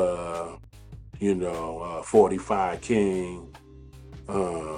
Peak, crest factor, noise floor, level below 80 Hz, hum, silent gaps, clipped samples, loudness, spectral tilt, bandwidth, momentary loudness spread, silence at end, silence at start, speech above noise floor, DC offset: -6 dBFS; 22 dB; -47 dBFS; -50 dBFS; none; none; under 0.1%; -26 LUFS; -6.5 dB/octave; 11 kHz; 25 LU; 0 s; 0 s; 22 dB; under 0.1%